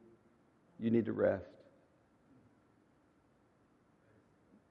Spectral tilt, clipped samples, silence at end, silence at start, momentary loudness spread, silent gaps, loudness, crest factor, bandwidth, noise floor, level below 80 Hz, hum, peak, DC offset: -10 dB/octave; under 0.1%; 3.2 s; 0.8 s; 11 LU; none; -35 LUFS; 22 dB; 4.6 kHz; -71 dBFS; -80 dBFS; none; -20 dBFS; under 0.1%